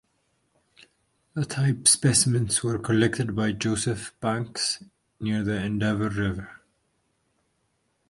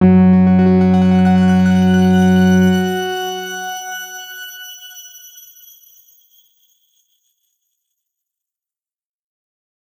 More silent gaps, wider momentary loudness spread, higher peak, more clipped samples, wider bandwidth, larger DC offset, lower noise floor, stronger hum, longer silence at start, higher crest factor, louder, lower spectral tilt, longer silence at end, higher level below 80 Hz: neither; second, 13 LU vs 20 LU; about the same, -4 dBFS vs -2 dBFS; neither; second, 11.5 kHz vs 20 kHz; neither; second, -72 dBFS vs under -90 dBFS; neither; first, 1.35 s vs 0 s; first, 22 dB vs 14 dB; second, -24 LUFS vs -13 LUFS; second, -4 dB/octave vs -7 dB/octave; second, 1.55 s vs 4.9 s; first, -52 dBFS vs -60 dBFS